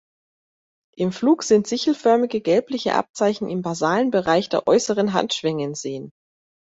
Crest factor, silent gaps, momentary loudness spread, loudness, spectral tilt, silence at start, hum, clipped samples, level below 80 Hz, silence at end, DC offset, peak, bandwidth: 18 dB; 3.09-3.14 s; 8 LU; -21 LUFS; -4.5 dB/octave; 1 s; none; under 0.1%; -62 dBFS; 0.6 s; under 0.1%; -4 dBFS; 8 kHz